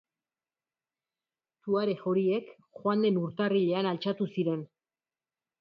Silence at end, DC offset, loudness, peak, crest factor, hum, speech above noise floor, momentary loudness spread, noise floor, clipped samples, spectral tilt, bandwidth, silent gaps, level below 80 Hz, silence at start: 0.95 s; under 0.1%; -30 LUFS; -16 dBFS; 16 dB; none; over 61 dB; 7 LU; under -90 dBFS; under 0.1%; -9 dB/octave; 5.8 kHz; none; -78 dBFS; 1.65 s